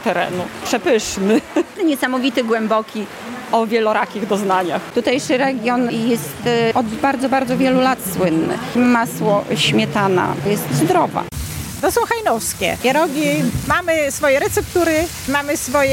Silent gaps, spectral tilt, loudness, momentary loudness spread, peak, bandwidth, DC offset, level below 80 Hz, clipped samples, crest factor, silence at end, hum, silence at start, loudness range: none; -4.5 dB/octave; -17 LUFS; 5 LU; -2 dBFS; 17 kHz; under 0.1%; -44 dBFS; under 0.1%; 14 dB; 0 s; none; 0 s; 2 LU